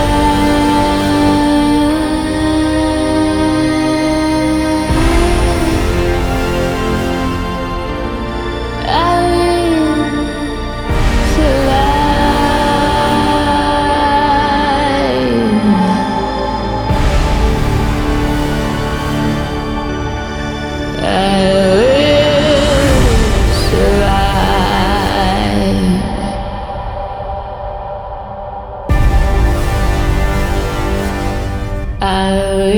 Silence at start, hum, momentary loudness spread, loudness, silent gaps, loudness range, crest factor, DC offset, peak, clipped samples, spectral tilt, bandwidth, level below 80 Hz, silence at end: 0 s; none; 9 LU; -14 LUFS; none; 5 LU; 12 dB; under 0.1%; 0 dBFS; under 0.1%; -5.5 dB/octave; 20 kHz; -20 dBFS; 0 s